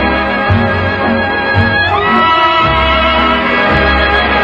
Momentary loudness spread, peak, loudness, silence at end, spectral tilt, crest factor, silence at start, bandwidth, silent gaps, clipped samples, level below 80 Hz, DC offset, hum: 4 LU; 0 dBFS; -10 LUFS; 0 s; -7 dB/octave; 10 dB; 0 s; 8.2 kHz; none; under 0.1%; -24 dBFS; under 0.1%; none